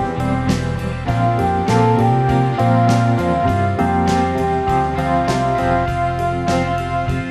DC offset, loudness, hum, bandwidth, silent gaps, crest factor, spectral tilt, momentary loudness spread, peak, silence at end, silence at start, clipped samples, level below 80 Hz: under 0.1%; -17 LUFS; none; 12.5 kHz; none; 14 dB; -7 dB/octave; 5 LU; -2 dBFS; 0 s; 0 s; under 0.1%; -32 dBFS